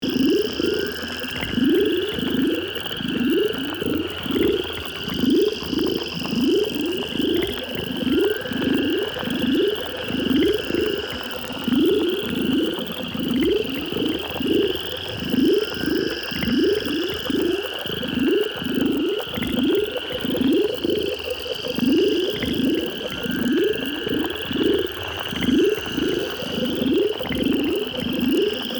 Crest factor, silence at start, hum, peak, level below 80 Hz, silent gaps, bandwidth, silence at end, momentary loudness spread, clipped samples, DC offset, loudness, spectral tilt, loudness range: 14 dB; 0 s; none; -8 dBFS; -48 dBFS; none; over 20 kHz; 0 s; 6 LU; under 0.1%; under 0.1%; -22 LUFS; -5 dB/octave; 1 LU